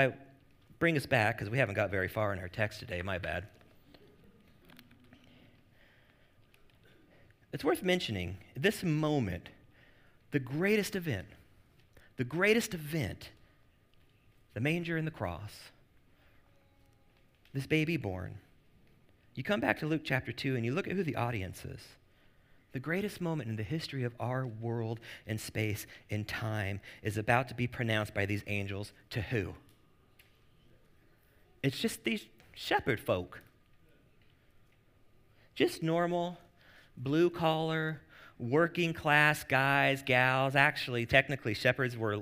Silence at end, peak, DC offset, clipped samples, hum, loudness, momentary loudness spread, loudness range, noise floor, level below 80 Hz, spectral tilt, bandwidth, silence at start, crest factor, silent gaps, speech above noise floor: 0 s; -8 dBFS; under 0.1%; under 0.1%; none; -33 LUFS; 16 LU; 11 LU; -65 dBFS; -62 dBFS; -5.5 dB/octave; 16 kHz; 0 s; 26 dB; none; 33 dB